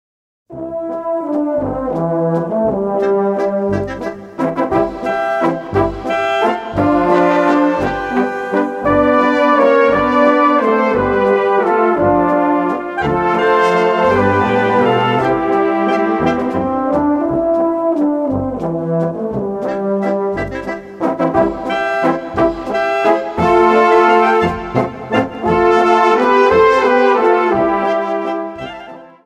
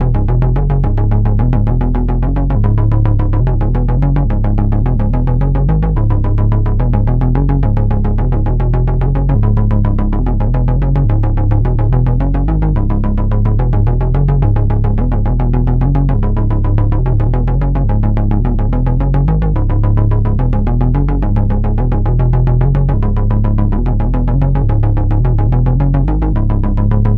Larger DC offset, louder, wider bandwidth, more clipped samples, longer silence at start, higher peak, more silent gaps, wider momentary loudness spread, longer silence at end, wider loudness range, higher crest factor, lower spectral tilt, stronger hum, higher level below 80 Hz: neither; about the same, -14 LUFS vs -14 LUFS; first, 10.5 kHz vs 3.4 kHz; neither; first, 0.5 s vs 0 s; about the same, 0 dBFS vs -2 dBFS; neither; first, 9 LU vs 2 LU; first, 0.2 s vs 0 s; first, 5 LU vs 0 LU; about the same, 14 dB vs 10 dB; second, -7 dB/octave vs -11.5 dB/octave; neither; second, -42 dBFS vs -14 dBFS